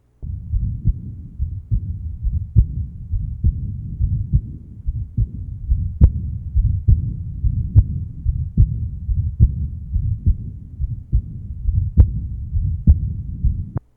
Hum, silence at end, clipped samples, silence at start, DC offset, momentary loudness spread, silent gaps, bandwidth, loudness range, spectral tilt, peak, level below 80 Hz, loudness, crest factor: none; 0.15 s; under 0.1%; 0.2 s; under 0.1%; 12 LU; none; 1.3 kHz; 4 LU; -13.5 dB/octave; 0 dBFS; -22 dBFS; -22 LUFS; 18 dB